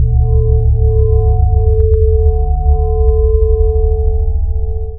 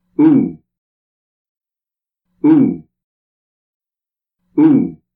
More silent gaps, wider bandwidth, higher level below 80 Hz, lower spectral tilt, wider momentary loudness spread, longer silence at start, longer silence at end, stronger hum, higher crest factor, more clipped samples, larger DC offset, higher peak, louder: second, none vs 0.78-1.61 s, 3.04-3.80 s; second, 1.1 kHz vs 3.5 kHz; first, -12 dBFS vs -60 dBFS; first, -14 dB/octave vs -12.5 dB/octave; second, 5 LU vs 11 LU; second, 0 s vs 0.2 s; second, 0 s vs 0.2 s; neither; second, 10 dB vs 16 dB; neither; neither; about the same, 0 dBFS vs -2 dBFS; about the same, -13 LUFS vs -13 LUFS